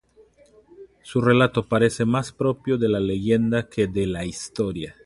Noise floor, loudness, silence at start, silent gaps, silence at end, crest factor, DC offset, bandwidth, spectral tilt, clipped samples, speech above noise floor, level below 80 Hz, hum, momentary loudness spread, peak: -55 dBFS; -22 LUFS; 0.8 s; none; 0.15 s; 20 dB; under 0.1%; 11.5 kHz; -6.5 dB/octave; under 0.1%; 33 dB; -48 dBFS; none; 9 LU; -4 dBFS